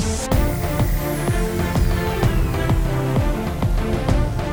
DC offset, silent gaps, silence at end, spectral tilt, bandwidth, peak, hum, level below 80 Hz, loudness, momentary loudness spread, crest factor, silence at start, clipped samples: under 0.1%; none; 0 s; -6 dB/octave; over 20 kHz; -4 dBFS; none; -24 dBFS; -21 LUFS; 2 LU; 14 dB; 0 s; under 0.1%